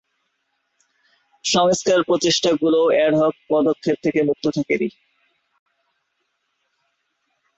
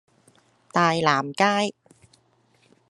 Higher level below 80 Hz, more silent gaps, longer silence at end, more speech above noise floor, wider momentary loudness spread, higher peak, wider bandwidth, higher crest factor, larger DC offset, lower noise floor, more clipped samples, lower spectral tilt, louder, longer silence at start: first, -62 dBFS vs -70 dBFS; neither; first, 2.7 s vs 1.2 s; first, 54 dB vs 41 dB; about the same, 6 LU vs 7 LU; about the same, -4 dBFS vs -4 dBFS; second, 8.2 kHz vs 11.5 kHz; second, 16 dB vs 22 dB; neither; first, -72 dBFS vs -63 dBFS; neither; about the same, -4 dB/octave vs -4.5 dB/octave; first, -19 LUFS vs -22 LUFS; first, 1.45 s vs 0.75 s